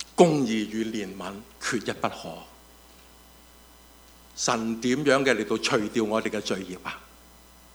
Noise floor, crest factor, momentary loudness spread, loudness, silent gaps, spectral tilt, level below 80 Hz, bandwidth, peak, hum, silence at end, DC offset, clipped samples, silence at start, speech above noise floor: -52 dBFS; 26 dB; 17 LU; -26 LUFS; none; -4 dB/octave; -58 dBFS; over 20 kHz; -2 dBFS; none; 0.7 s; under 0.1%; under 0.1%; 0 s; 26 dB